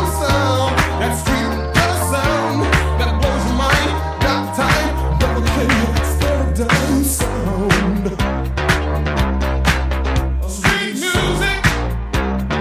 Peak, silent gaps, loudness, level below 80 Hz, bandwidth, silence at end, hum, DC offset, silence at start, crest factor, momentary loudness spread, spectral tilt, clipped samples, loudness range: -2 dBFS; none; -17 LUFS; -22 dBFS; 16 kHz; 0 s; none; under 0.1%; 0 s; 16 dB; 4 LU; -5 dB/octave; under 0.1%; 1 LU